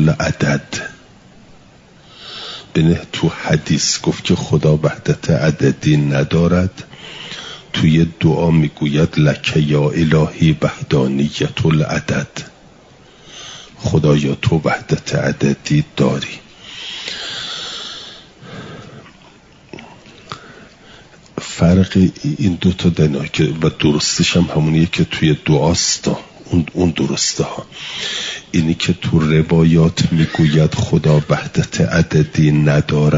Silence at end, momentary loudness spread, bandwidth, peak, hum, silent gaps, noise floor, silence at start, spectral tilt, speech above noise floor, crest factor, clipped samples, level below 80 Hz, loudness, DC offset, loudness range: 0 s; 17 LU; 7.8 kHz; -2 dBFS; none; none; -45 dBFS; 0 s; -5.5 dB/octave; 30 dB; 14 dB; under 0.1%; -42 dBFS; -16 LUFS; under 0.1%; 8 LU